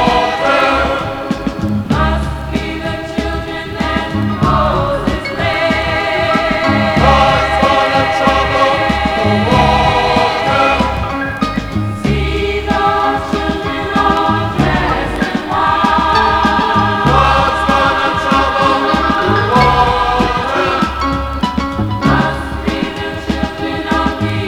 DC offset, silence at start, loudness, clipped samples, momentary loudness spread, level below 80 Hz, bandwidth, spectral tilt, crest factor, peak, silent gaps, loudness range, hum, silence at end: under 0.1%; 0 s; -13 LUFS; under 0.1%; 8 LU; -26 dBFS; 17 kHz; -6 dB/octave; 12 dB; 0 dBFS; none; 5 LU; none; 0 s